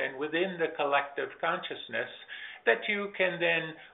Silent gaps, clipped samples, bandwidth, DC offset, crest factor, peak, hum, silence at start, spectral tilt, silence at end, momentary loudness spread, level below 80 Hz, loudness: none; under 0.1%; 4.1 kHz; under 0.1%; 22 dB; -10 dBFS; none; 0 s; -1.5 dB/octave; 0.05 s; 8 LU; -78 dBFS; -30 LUFS